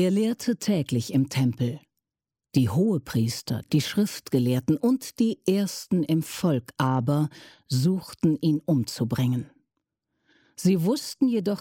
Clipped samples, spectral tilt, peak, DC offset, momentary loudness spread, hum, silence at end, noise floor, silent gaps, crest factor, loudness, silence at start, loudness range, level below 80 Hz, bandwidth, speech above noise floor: under 0.1%; -6.5 dB/octave; -10 dBFS; under 0.1%; 4 LU; none; 0 s; -90 dBFS; none; 16 dB; -25 LUFS; 0 s; 2 LU; -62 dBFS; 17 kHz; 65 dB